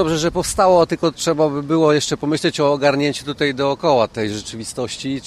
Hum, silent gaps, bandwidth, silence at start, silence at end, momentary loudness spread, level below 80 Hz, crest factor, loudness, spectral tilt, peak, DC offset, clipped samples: none; none; 14.5 kHz; 0 s; 0 s; 10 LU; -44 dBFS; 16 dB; -18 LUFS; -4.5 dB/octave; -2 dBFS; under 0.1%; under 0.1%